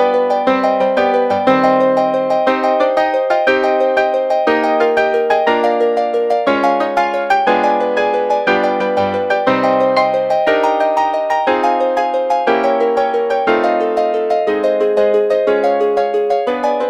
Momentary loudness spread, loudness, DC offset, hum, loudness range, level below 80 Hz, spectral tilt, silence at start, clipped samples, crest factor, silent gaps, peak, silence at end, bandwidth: 3 LU; -14 LUFS; under 0.1%; none; 1 LU; -56 dBFS; -5.5 dB/octave; 0 s; under 0.1%; 14 dB; none; 0 dBFS; 0 s; 10 kHz